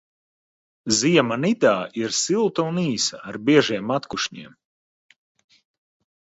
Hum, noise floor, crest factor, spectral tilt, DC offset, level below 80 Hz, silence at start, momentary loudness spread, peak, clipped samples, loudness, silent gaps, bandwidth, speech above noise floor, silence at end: none; under -90 dBFS; 20 dB; -4 dB/octave; under 0.1%; -64 dBFS; 0.85 s; 9 LU; -2 dBFS; under 0.1%; -21 LUFS; none; 8.2 kHz; over 69 dB; 1.9 s